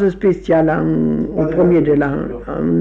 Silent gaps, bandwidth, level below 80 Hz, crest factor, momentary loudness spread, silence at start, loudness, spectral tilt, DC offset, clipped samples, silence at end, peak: none; 7.2 kHz; -36 dBFS; 10 dB; 8 LU; 0 s; -16 LUFS; -10 dB/octave; under 0.1%; under 0.1%; 0 s; -6 dBFS